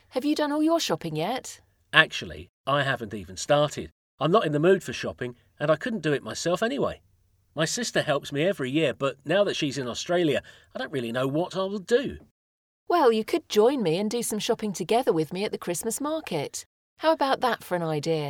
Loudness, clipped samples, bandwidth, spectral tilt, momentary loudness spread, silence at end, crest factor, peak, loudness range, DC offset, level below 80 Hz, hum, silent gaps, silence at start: -26 LUFS; under 0.1%; 18 kHz; -4.5 dB/octave; 12 LU; 0 s; 26 dB; 0 dBFS; 3 LU; under 0.1%; -60 dBFS; none; 2.49-2.64 s, 3.92-4.18 s, 12.31-12.87 s, 16.66-16.97 s; 0.15 s